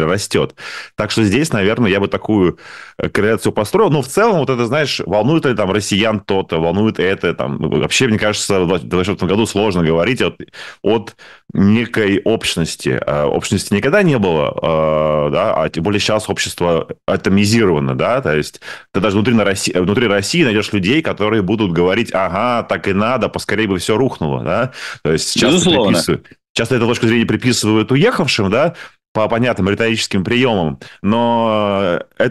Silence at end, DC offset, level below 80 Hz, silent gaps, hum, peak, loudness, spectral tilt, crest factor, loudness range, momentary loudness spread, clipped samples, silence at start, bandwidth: 0 s; 0.4%; -44 dBFS; 26.49-26.55 s, 29.08-29.15 s; none; -4 dBFS; -15 LUFS; -5 dB/octave; 12 dB; 2 LU; 6 LU; under 0.1%; 0 s; 12.5 kHz